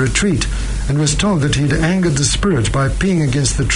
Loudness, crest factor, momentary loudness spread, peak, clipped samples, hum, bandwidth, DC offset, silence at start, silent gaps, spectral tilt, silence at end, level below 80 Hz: -16 LUFS; 14 dB; 4 LU; -2 dBFS; under 0.1%; none; 11 kHz; under 0.1%; 0 s; none; -4.5 dB/octave; 0 s; -24 dBFS